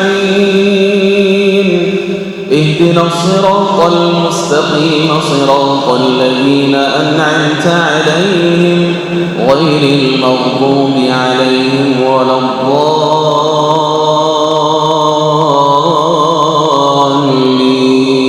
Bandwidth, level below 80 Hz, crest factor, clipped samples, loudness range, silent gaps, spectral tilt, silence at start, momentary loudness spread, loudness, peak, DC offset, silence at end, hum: 13 kHz; -52 dBFS; 10 dB; 0.5%; 1 LU; none; -5.5 dB/octave; 0 s; 2 LU; -9 LUFS; 0 dBFS; under 0.1%; 0 s; none